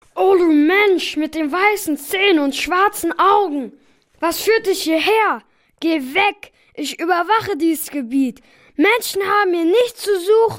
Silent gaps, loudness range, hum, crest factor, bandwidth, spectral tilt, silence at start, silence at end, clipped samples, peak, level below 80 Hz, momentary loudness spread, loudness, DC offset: none; 3 LU; none; 14 dB; 16.5 kHz; -3 dB/octave; 0.15 s; 0 s; under 0.1%; -2 dBFS; -56 dBFS; 9 LU; -17 LUFS; under 0.1%